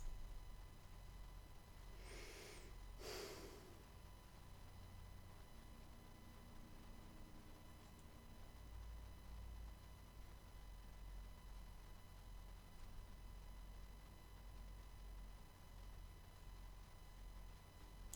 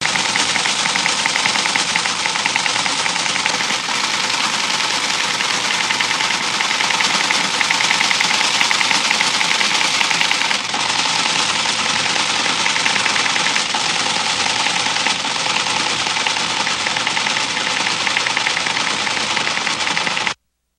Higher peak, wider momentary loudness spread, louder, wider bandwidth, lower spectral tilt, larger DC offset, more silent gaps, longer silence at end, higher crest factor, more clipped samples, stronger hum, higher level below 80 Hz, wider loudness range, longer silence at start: second, -34 dBFS vs 0 dBFS; first, 6 LU vs 3 LU; second, -60 LUFS vs -16 LUFS; first, over 20 kHz vs 16.5 kHz; first, -4.5 dB/octave vs 0 dB/octave; neither; neither; second, 0 s vs 0.45 s; about the same, 22 dB vs 18 dB; neither; neither; about the same, -58 dBFS vs -60 dBFS; about the same, 5 LU vs 3 LU; about the same, 0 s vs 0 s